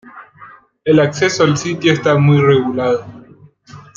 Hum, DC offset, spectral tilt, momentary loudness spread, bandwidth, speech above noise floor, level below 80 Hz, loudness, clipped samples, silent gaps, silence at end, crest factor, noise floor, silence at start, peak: none; under 0.1%; -6 dB/octave; 7 LU; 7.6 kHz; 30 dB; -54 dBFS; -14 LUFS; under 0.1%; none; 0.15 s; 14 dB; -43 dBFS; 0.05 s; 0 dBFS